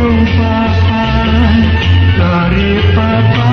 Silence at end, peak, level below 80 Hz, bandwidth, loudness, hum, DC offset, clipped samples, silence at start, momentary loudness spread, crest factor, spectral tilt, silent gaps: 0 s; 0 dBFS; -18 dBFS; 6.2 kHz; -10 LUFS; none; under 0.1%; under 0.1%; 0 s; 2 LU; 8 dB; -8 dB/octave; none